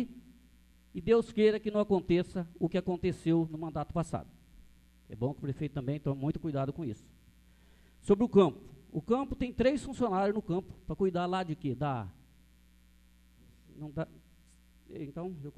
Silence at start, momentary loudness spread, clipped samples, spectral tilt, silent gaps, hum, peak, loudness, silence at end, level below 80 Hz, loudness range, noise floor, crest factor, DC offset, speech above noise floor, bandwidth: 0 s; 15 LU; under 0.1%; -8 dB/octave; none; none; -10 dBFS; -32 LUFS; 0.05 s; -54 dBFS; 9 LU; -62 dBFS; 22 dB; under 0.1%; 30 dB; 12.5 kHz